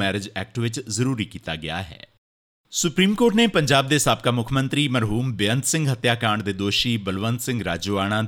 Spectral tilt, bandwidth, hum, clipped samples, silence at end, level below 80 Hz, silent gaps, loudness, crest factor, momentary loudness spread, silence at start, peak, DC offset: -4.5 dB/octave; 18.5 kHz; none; under 0.1%; 0 s; -48 dBFS; 2.18-2.64 s; -22 LUFS; 18 dB; 10 LU; 0 s; -4 dBFS; under 0.1%